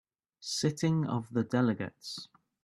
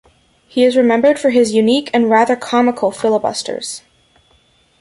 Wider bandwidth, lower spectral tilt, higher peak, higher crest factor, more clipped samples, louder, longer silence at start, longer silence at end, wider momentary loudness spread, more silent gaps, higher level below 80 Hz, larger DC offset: first, 13 kHz vs 11.5 kHz; first, -5.5 dB/octave vs -4 dB/octave; second, -14 dBFS vs 0 dBFS; about the same, 18 dB vs 14 dB; neither; second, -32 LUFS vs -14 LUFS; second, 0.4 s vs 0.55 s; second, 0.4 s vs 1.05 s; first, 14 LU vs 11 LU; neither; second, -70 dBFS vs -58 dBFS; neither